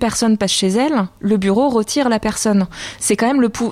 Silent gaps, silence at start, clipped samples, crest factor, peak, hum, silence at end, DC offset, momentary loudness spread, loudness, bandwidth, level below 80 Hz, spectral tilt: none; 0 s; under 0.1%; 10 dB; -6 dBFS; none; 0 s; under 0.1%; 4 LU; -16 LUFS; 15.5 kHz; -44 dBFS; -4.5 dB/octave